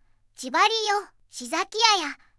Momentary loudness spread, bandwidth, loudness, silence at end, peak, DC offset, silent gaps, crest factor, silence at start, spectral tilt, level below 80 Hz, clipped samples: 18 LU; 12 kHz; -23 LUFS; 0.25 s; -4 dBFS; under 0.1%; none; 20 dB; 0.4 s; 1 dB/octave; -66 dBFS; under 0.1%